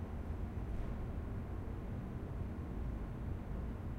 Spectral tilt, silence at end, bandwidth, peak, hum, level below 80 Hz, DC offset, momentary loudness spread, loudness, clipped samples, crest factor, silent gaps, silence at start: -9 dB/octave; 0 s; 10 kHz; -30 dBFS; none; -46 dBFS; under 0.1%; 1 LU; -44 LUFS; under 0.1%; 12 dB; none; 0 s